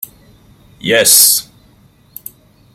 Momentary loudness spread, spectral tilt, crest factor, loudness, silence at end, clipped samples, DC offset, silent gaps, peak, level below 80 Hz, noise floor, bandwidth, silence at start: 26 LU; -0.5 dB/octave; 16 dB; -8 LUFS; 1.35 s; 0.3%; under 0.1%; none; 0 dBFS; -54 dBFS; -48 dBFS; over 20 kHz; 0 s